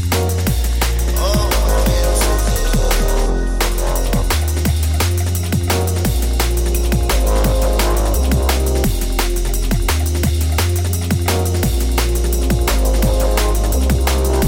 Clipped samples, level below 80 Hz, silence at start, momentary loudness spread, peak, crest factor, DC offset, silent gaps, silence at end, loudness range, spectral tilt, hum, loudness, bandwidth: under 0.1%; -16 dBFS; 0 s; 3 LU; -4 dBFS; 10 dB; under 0.1%; none; 0 s; 1 LU; -4.5 dB/octave; none; -17 LUFS; 17 kHz